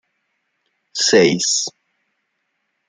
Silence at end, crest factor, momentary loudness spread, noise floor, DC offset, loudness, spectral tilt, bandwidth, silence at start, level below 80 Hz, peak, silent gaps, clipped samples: 1.2 s; 20 dB; 14 LU; -72 dBFS; under 0.1%; -16 LUFS; -2.5 dB/octave; 10.5 kHz; 0.95 s; -64 dBFS; -2 dBFS; none; under 0.1%